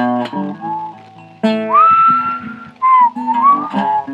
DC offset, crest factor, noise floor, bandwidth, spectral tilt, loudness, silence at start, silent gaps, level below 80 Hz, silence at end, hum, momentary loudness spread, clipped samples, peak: under 0.1%; 12 dB; -38 dBFS; 8.4 kHz; -7 dB/octave; -13 LUFS; 0 s; none; -62 dBFS; 0 s; none; 15 LU; under 0.1%; -2 dBFS